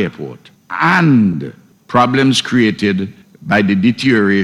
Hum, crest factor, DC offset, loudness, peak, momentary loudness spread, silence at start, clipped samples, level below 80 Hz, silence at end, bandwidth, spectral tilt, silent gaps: none; 14 dB; under 0.1%; -13 LUFS; 0 dBFS; 16 LU; 0 s; under 0.1%; -54 dBFS; 0 s; 12.5 kHz; -5.5 dB/octave; none